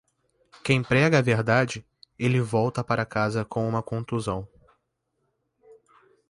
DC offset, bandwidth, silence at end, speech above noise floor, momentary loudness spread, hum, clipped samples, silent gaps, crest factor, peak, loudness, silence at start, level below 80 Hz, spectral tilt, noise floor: under 0.1%; 11.5 kHz; 0.55 s; 52 dB; 10 LU; none; under 0.1%; none; 20 dB; -6 dBFS; -25 LUFS; 0.65 s; -56 dBFS; -6.5 dB/octave; -76 dBFS